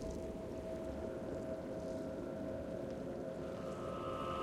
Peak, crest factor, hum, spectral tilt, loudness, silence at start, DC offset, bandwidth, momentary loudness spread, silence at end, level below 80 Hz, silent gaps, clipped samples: -30 dBFS; 12 dB; none; -7 dB/octave; -44 LUFS; 0 s; under 0.1%; 15.5 kHz; 2 LU; 0 s; -58 dBFS; none; under 0.1%